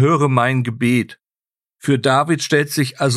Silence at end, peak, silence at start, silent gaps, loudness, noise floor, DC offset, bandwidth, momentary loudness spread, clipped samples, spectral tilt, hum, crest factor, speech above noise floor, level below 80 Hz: 0 s; -2 dBFS; 0 s; none; -17 LUFS; under -90 dBFS; under 0.1%; 14 kHz; 5 LU; under 0.1%; -5.5 dB/octave; none; 16 dB; over 74 dB; -62 dBFS